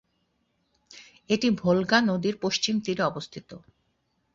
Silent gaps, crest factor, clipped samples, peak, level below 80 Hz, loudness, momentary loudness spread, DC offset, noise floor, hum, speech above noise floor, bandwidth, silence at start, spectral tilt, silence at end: none; 24 dB; under 0.1%; -4 dBFS; -64 dBFS; -25 LUFS; 14 LU; under 0.1%; -73 dBFS; none; 48 dB; 7.8 kHz; 0.95 s; -4.5 dB/octave; 0.75 s